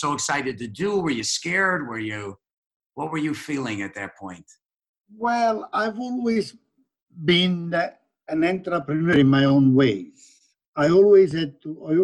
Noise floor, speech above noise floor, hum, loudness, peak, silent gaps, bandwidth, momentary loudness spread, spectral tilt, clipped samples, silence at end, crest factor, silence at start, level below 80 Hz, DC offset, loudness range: -56 dBFS; 34 dB; none; -22 LUFS; -6 dBFS; 2.53-2.63 s, 2.76-2.80 s, 2.86-2.90 s, 4.89-4.94 s, 5.00-5.04 s, 10.68-10.72 s; 12 kHz; 17 LU; -5 dB/octave; under 0.1%; 0 s; 16 dB; 0 s; -60 dBFS; under 0.1%; 9 LU